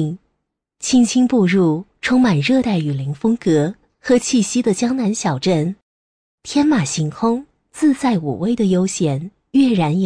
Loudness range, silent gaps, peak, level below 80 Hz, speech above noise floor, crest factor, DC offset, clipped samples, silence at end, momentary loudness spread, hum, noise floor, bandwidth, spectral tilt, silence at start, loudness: 3 LU; 5.82-6.38 s; -4 dBFS; -52 dBFS; 58 dB; 14 dB; under 0.1%; under 0.1%; 0 s; 10 LU; none; -74 dBFS; 10.5 kHz; -5.5 dB/octave; 0 s; -17 LUFS